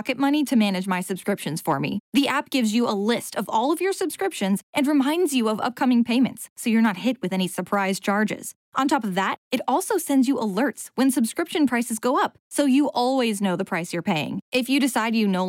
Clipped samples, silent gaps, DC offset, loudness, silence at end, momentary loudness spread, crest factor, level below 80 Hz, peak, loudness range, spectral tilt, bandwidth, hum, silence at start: under 0.1%; 2.00-2.12 s, 4.63-4.73 s, 6.50-6.56 s, 8.56-8.72 s, 9.38-9.51 s, 12.40-12.51 s, 14.42-14.52 s; under 0.1%; -23 LUFS; 0 s; 5 LU; 12 dB; -72 dBFS; -10 dBFS; 1 LU; -4.5 dB/octave; 17 kHz; none; 0 s